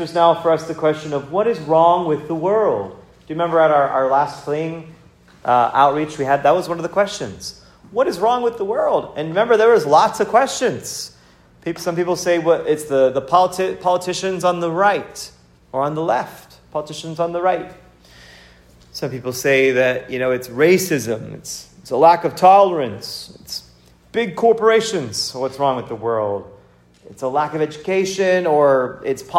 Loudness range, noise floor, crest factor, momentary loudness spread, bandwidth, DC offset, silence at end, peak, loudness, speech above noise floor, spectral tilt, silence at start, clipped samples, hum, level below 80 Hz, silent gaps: 5 LU; -50 dBFS; 18 dB; 15 LU; 16 kHz; under 0.1%; 0 s; 0 dBFS; -18 LUFS; 32 dB; -4.5 dB/octave; 0 s; under 0.1%; none; -56 dBFS; none